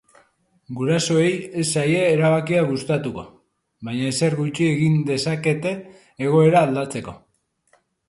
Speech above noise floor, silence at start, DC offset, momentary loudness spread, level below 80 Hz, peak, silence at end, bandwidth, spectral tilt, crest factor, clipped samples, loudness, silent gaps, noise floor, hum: 45 dB; 0.7 s; under 0.1%; 14 LU; -58 dBFS; -2 dBFS; 0.9 s; 11.5 kHz; -5.5 dB/octave; 18 dB; under 0.1%; -20 LUFS; none; -64 dBFS; none